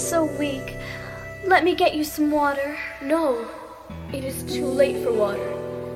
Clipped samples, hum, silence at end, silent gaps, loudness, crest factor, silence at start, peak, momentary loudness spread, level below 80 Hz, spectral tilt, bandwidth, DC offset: under 0.1%; none; 0 s; none; -23 LUFS; 18 dB; 0 s; -6 dBFS; 14 LU; -48 dBFS; -4.5 dB/octave; 16.5 kHz; under 0.1%